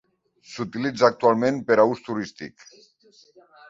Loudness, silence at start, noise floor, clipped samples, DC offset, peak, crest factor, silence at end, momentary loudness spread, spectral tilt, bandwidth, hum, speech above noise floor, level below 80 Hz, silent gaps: -22 LUFS; 0.5 s; -56 dBFS; under 0.1%; under 0.1%; -2 dBFS; 22 dB; 1.2 s; 20 LU; -6 dB/octave; 7.8 kHz; none; 34 dB; -66 dBFS; none